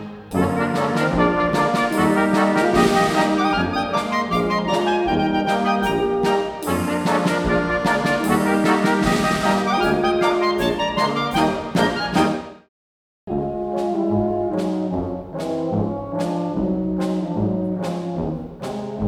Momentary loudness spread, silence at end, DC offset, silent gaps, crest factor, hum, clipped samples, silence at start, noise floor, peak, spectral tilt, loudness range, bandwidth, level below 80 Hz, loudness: 8 LU; 0 s; under 0.1%; 12.69-13.27 s; 16 dB; none; under 0.1%; 0 s; under -90 dBFS; -4 dBFS; -5.5 dB/octave; 5 LU; 18 kHz; -42 dBFS; -20 LUFS